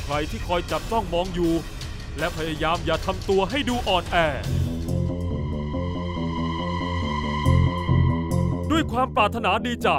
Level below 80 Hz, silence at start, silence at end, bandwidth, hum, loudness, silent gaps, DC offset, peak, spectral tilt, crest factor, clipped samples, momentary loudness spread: -34 dBFS; 0 s; 0 s; 16 kHz; none; -24 LUFS; none; under 0.1%; -6 dBFS; -6 dB/octave; 18 dB; under 0.1%; 7 LU